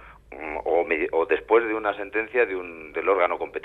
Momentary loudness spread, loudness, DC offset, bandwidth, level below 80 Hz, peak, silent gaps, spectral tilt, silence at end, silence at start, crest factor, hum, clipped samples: 12 LU; -24 LUFS; under 0.1%; 4.1 kHz; -54 dBFS; -6 dBFS; none; -6.5 dB/octave; 0 s; 0 s; 18 dB; none; under 0.1%